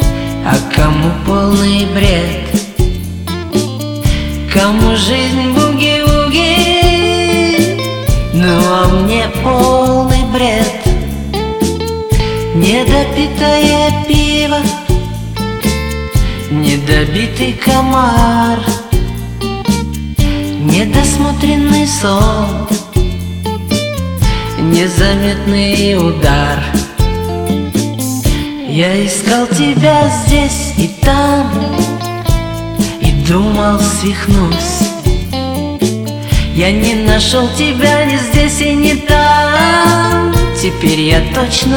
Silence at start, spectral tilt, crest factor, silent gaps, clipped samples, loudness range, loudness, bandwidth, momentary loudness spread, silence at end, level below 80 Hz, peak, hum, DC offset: 0 s; -5 dB/octave; 12 dB; none; 0.3%; 4 LU; -12 LUFS; over 20 kHz; 7 LU; 0 s; -20 dBFS; 0 dBFS; none; under 0.1%